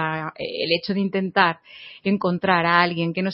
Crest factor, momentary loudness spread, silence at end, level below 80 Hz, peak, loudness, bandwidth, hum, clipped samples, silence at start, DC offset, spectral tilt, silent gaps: 20 dB; 11 LU; 0 s; -64 dBFS; -2 dBFS; -21 LUFS; 5.8 kHz; none; under 0.1%; 0 s; under 0.1%; -10 dB/octave; none